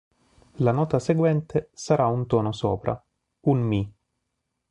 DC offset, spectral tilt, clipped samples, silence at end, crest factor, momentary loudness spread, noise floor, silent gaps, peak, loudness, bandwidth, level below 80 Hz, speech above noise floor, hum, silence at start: under 0.1%; -7.5 dB/octave; under 0.1%; 0.8 s; 18 dB; 7 LU; -79 dBFS; none; -8 dBFS; -24 LUFS; 10.5 kHz; -52 dBFS; 56 dB; none; 0.6 s